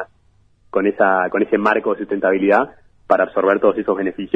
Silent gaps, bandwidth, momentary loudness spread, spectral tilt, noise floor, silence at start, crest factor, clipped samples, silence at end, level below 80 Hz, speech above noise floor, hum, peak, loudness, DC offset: none; 7.2 kHz; 6 LU; -8 dB/octave; -56 dBFS; 0 s; 18 dB; under 0.1%; 0.1 s; -56 dBFS; 39 dB; none; 0 dBFS; -17 LUFS; under 0.1%